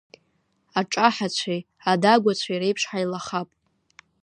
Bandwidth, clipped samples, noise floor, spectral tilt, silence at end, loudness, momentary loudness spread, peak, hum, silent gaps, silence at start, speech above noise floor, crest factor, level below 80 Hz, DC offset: 10 kHz; under 0.1%; -69 dBFS; -4 dB/octave; 0.75 s; -23 LUFS; 11 LU; -2 dBFS; none; none; 0.75 s; 46 dB; 22 dB; -72 dBFS; under 0.1%